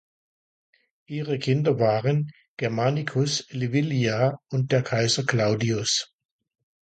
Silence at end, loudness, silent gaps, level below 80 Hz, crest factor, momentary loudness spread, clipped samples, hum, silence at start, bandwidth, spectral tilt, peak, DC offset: 0.9 s; -24 LUFS; 2.48-2.57 s; -62 dBFS; 20 dB; 7 LU; under 0.1%; none; 1.1 s; 9.2 kHz; -5 dB/octave; -4 dBFS; under 0.1%